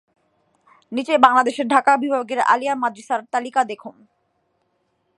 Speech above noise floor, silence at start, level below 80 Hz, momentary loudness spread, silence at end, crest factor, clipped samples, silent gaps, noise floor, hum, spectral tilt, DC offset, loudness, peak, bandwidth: 50 dB; 0.9 s; -72 dBFS; 12 LU; 1.25 s; 20 dB; under 0.1%; none; -69 dBFS; none; -3 dB/octave; under 0.1%; -19 LUFS; 0 dBFS; 11.5 kHz